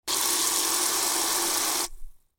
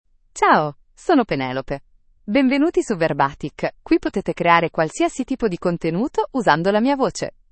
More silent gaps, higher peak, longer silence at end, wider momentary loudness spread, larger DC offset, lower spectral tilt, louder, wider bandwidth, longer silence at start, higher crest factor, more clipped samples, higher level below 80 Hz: neither; second, -10 dBFS vs 0 dBFS; about the same, 0.2 s vs 0.2 s; second, 4 LU vs 11 LU; neither; second, 1 dB/octave vs -5.5 dB/octave; second, -23 LUFS vs -20 LUFS; first, 17 kHz vs 8.8 kHz; second, 0.05 s vs 0.35 s; about the same, 18 dB vs 20 dB; neither; about the same, -48 dBFS vs -48 dBFS